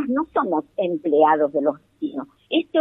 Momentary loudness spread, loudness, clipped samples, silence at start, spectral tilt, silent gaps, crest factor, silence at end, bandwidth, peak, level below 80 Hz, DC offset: 13 LU; -22 LUFS; under 0.1%; 0 s; -8 dB/octave; none; 16 dB; 0 s; 4 kHz; -4 dBFS; -64 dBFS; under 0.1%